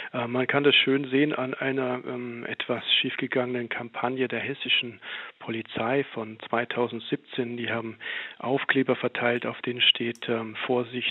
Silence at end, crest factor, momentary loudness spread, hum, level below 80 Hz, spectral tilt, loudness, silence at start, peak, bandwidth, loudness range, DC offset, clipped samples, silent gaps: 0 s; 20 dB; 13 LU; none; -78 dBFS; -6.5 dB/octave; -26 LUFS; 0 s; -6 dBFS; 6.4 kHz; 5 LU; under 0.1%; under 0.1%; none